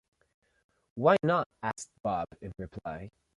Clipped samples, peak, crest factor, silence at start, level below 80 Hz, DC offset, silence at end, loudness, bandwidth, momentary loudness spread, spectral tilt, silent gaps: under 0.1%; -10 dBFS; 22 dB; 0.95 s; -60 dBFS; under 0.1%; 0.3 s; -30 LUFS; 11.5 kHz; 17 LU; -6 dB/octave; 1.46-1.50 s, 2.00-2.04 s